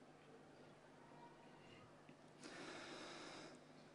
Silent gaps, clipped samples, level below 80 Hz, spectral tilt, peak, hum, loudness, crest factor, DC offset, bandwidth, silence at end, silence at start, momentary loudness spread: none; under 0.1%; -88 dBFS; -3.5 dB/octave; -42 dBFS; 50 Hz at -75 dBFS; -59 LUFS; 18 dB; under 0.1%; 10.5 kHz; 0 s; 0 s; 11 LU